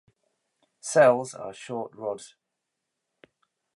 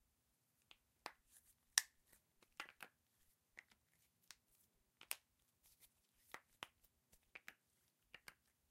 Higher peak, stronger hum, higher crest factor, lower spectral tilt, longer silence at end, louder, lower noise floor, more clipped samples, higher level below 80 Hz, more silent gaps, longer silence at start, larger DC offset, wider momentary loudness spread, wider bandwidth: about the same, -8 dBFS vs -10 dBFS; neither; second, 22 dB vs 46 dB; first, -4.5 dB/octave vs 2.5 dB/octave; first, 1.5 s vs 1.2 s; first, -25 LUFS vs -47 LUFS; about the same, -83 dBFS vs -84 dBFS; neither; first, -80 dBFS vs -88 dBFS; neither; second, 0.85 s vs 1.05 s; neither; second, 19 LU vs 25 LU; second, 11.5 kHz vs 16 kHz